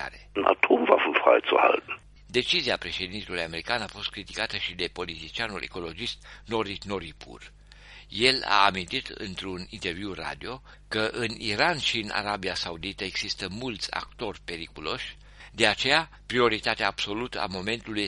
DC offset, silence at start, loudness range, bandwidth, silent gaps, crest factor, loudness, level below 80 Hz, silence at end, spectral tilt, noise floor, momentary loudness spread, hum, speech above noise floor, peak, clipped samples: under 0.1%; 0 s; 8 LU; 11.5 kHz; none; 26 dB; -27 LUFS; -52 dBFS; 0 s; -3.5 dB/octave; -49 dBFS; 15 LU; none; 20 dB; -2 dBFS; under 0.1%